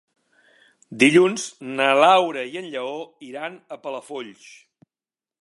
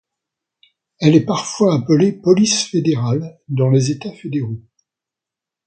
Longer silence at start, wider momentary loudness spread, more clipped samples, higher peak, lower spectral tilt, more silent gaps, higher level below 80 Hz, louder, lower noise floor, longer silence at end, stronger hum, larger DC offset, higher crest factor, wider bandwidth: about the same, 0.9 s vs 1 s; first, 20 LU vs 11 LU; neither; about the same, -2 dBFS vs 0 dBFS; second, -4 dB/octave vs -5.5 dB/octave; neither; second, -76 dBFS vs -58 dBFS; second, -19 LUFS vs -16 LUFS; first, under -90 dBFS vs -86 dBFS; about the same, 1.1 s vs 1.05 s; neither; neither; about the same, 22 dB vs 18 dB; first, 11.5 kHz vs 9.2 kHz